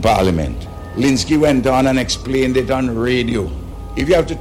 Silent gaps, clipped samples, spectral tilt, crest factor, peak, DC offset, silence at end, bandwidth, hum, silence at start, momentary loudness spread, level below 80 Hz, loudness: none; under 0.1%; -5.5 dB/octave; 14 dB; -2 dBFS; under 0.1%; 0 s; 16 kHz; none; 0 s; 12 LU; -30 dBFS; -16 LUFS